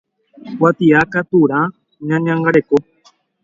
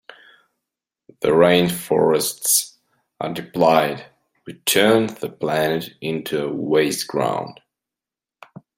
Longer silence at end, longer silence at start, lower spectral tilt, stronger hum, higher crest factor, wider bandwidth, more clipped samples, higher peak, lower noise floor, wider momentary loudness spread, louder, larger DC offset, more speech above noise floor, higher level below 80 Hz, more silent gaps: second, 0.6 s vs 1.25 s; second, 0.45 s vs 1.2 s; first, -8.5 dB/octave vs -3.5 dB/octave; neither; about the same, 16 dB vs 20 dB; second, 7.4 kHz vs 16.5 kHz; neither; about the same, 0 dBFS vs -2 dBFS; second, -54 dBFS vs -89 dBFS; second, 9 LU vs 13 LU; first, -15 LUFS vs -19 LUFS; neither; second, 40 dB vs 70 dB; first, -54 dBFS vs -60 dBFS; neither